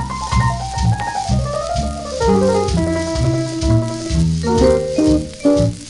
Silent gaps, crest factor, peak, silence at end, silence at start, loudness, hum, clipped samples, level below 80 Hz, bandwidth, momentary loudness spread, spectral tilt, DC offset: none; 14 dB; -2 dBFS; 0 s; 0 s; -17 LUFS; none; under 0.1%; -26 dBFS; 11.5 kHz; 6 LU; -6.5 dB/octave; under 0.1%